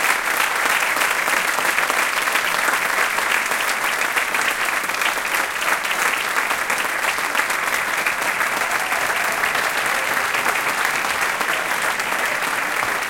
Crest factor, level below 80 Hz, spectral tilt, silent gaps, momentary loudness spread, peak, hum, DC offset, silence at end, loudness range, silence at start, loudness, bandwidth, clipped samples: 18 dB; -56 dBFS; 0 dB/octave; none; 2 LU; -2 dBFS; none; under 0.1%; 0 s; 1 LU; 0 s; -19 LUFS; 17 kHz; under 0.1%